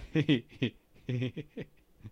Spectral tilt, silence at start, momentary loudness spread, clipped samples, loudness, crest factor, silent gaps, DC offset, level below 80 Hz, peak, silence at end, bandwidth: -7.5 dB/octave; 0 s; 19 LU; under 0.1%; -33 LUFS; 18 dB; none; under 0.1%; -58 dBFS; -16 dBFS; 0 s; 7.8 kHz